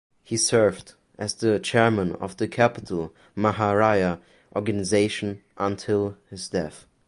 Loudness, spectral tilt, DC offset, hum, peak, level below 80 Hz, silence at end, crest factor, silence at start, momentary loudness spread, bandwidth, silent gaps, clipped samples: -24 LUFS; -4.5 dB/octave; under 0.1%; none; -4 dBFS; -52 dBFS; 0.3 s; 20 dB; 0.3 s; 12 LU; 11.5 kHz; none; under 0.1%